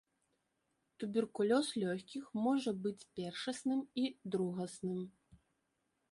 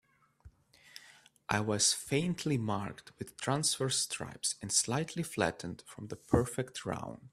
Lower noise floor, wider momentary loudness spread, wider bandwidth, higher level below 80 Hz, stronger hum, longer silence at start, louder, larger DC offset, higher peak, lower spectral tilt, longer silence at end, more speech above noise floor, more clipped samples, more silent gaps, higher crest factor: first, -83 dBFS vs -61 dBFS; second, 11 LU vs 18 LU; second, 11.5 kHz vs 15.5 kHz; second, -78 dBFS vs -60 dBFS; neither; first, 1 s vs 0.45 s; second, -38 LUFS vs -33 LUFS; neither; second, -20 dBFS vs -12 dBFS; first, -5.5 dB/octave vs -3.5 dB/octave; first, 1 s vs 0.05 s; first, 46 dB vs 26 dB; neither; neither; second, 18 dB vs 24 dB